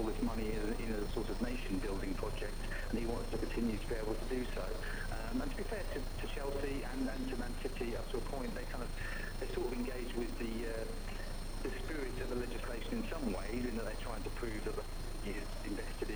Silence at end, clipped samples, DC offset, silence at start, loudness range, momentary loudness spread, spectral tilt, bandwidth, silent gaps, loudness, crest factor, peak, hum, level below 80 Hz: 0 s; under 0.1%; under 0.1%; 0 s; 2 LU; 4 LU; -5.5 dB/octave; over 20 kHz; none; -41 LUFS; 14 dB; -24 dBFS; none; -40 dBFS